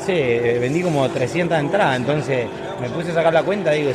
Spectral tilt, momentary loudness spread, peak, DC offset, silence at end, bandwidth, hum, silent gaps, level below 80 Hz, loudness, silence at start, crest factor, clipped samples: -6 dB/octave; 7 LU; -4 dBFS; under 0.1%; 0 s; 13.5 kHz; none; none; -54 dBFS; -19 LUFS; 0 s; 14 dB; under 0.1%